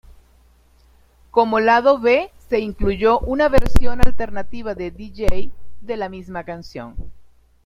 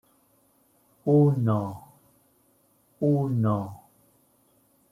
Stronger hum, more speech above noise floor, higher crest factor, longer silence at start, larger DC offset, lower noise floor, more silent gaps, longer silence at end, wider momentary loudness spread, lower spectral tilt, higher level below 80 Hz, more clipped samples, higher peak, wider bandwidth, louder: neither; second, 38 dB vs 42 dB; about the same, 16 dB vs 18 dB; first, 1.35 s vs 1.05 s; neither; second, -53 dBFS vs -65 dBFS; neither; second, 0.4 s vs 1.15 s; about the same, 17 LU vs 16 LU; second, -6.5 dB/octave vs -10.5 dB/octave; first, -28 dBFS vs -66 dBFS; first, 0.2% vs under 0.1%; first, 0 dBFS vs -10 dBFS; second, 11.5 kHz vs 14 kHz; first, -20 LUFS vs -25 LUFS